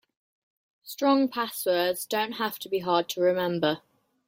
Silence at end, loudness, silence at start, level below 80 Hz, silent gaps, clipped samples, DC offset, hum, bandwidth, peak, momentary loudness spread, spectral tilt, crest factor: 0.5 s; -27 LUFS; 0.85 s; -74 dBFS; none; under 0.1%; under 0.1%; none; 16.5 kHz; -8 dBFS; 7 LU; -4 dB/octave; 18 dB